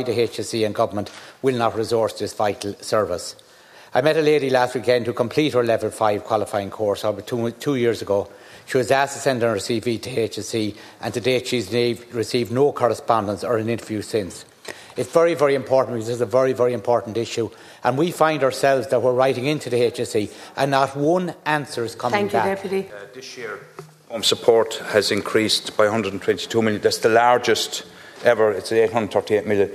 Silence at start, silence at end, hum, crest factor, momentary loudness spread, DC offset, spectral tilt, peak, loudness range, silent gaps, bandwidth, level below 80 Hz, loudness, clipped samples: 0 s; 0 s; none; 20 dB; 10 LU; under 0.1%; -4.5 dB/octave; 0 dBFS; 4 LU; none; 14 kHz; -64 dBFS; -21 LUFS; under 0.1%